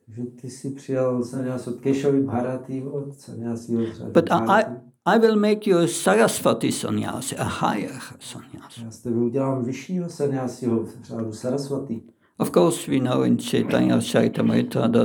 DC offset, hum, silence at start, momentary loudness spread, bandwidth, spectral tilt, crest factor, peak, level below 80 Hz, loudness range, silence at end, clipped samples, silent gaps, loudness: under 0.1%; none; 0.1 s; 15 LU; over 20 kHz; -5.5 dB/octave; 20 dB; -4 dBFS; -66 dBFS; 7 LU; 0 s; under 0.1%; none; -23 LUFS